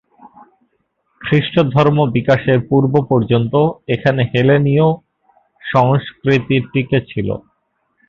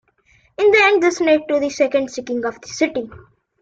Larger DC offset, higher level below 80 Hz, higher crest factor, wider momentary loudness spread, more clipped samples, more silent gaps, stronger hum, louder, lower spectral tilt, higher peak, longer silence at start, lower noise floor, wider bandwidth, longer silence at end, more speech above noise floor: neither; first, -48 dBFS vs -58 dBFS; about the same, 14 dB vs 16 dB; second, 9 LU vs 14 LU; neither; neither; neither; about the same, -15 LUFS vs -17 LUFS; first, -9 dB/octave vs -3 dB/octave; about the same, 0 dBFS vs -2 dBFS; second, 0.25 s vs 0.6 s; first, -66 dBFS vs -57 dBFS; second, 6.8 kHz vs 7.8 kHz; first, 0.7 s vs 0.45 s; first, 52 dB vs 40 dB